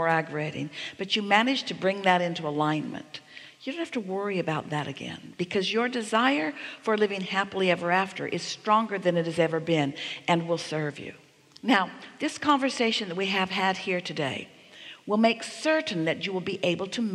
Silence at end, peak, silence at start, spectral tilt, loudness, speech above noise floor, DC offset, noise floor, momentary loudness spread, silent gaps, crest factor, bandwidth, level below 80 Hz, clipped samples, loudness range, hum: 0 s; -6 dBFS; 0 s; -4.5 dB/octave; -27 LUFS; 20 dB; under 0.1%; -48 dBFS; 12 LU; none; 22 dB; 12.5 kHz; -74 dBFS; under 0.1%; 3 LU; none